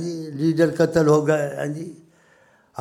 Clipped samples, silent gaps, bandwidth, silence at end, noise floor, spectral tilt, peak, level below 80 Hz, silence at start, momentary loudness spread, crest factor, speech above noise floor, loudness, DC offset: under 0.1%; none; 14.5 kHz; 0 s; -57 dBFS; -7 dB/octave; -4 dBFS; -58 dBFS; 0 s; 17 LU; 18 dB; 37 dB; -20 LUFS; under 0.1%